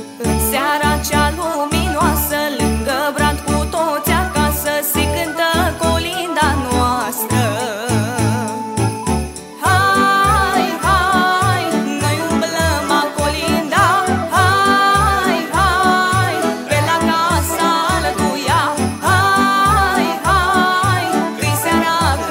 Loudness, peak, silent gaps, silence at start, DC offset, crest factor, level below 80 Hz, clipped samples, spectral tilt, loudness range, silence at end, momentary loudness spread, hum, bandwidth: -15 LUFS; 0 dBFS; none; 0 s; under 0.1%; 14 dB; -30 dBFS; under 0.1%; -4 dB/octave; 3 LU; 0 s; 6 LU; none; 16.5 kHz